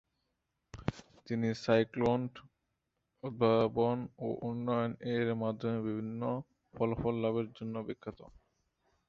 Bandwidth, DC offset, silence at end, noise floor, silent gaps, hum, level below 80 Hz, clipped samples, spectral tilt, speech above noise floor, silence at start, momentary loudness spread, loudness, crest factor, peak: 7.6 kHz; under 0.1%; 0.8 s; -84 dBFS; none; none; -62 dBFS; under 0.1%; -8 dB/octave; 50 dB; 0.75 s; 14 LU; -34 LUFS; 20 dB; -14 dBFS